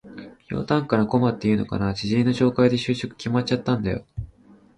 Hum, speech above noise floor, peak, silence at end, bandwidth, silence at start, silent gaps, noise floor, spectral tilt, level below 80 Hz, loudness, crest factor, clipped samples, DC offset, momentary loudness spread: none; 30 dB; -6 dBFS; 0.45 s; 10 kHz; 0.05 s; none; -52 dBFS; -7 dB/octave; -46 dBFS; -23 LUFS; 16 dB; under 0.1%; under 0.1%; 16 LU